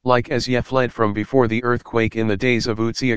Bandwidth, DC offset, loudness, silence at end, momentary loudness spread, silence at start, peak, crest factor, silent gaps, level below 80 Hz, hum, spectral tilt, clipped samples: 9.2 kHz; 2%; -20 LUFS; 0 s; 3 LU; 0 s; 0 dBFS; 18 dB; none; -44 dBFS; none; -6 dB/octave; under 0.1%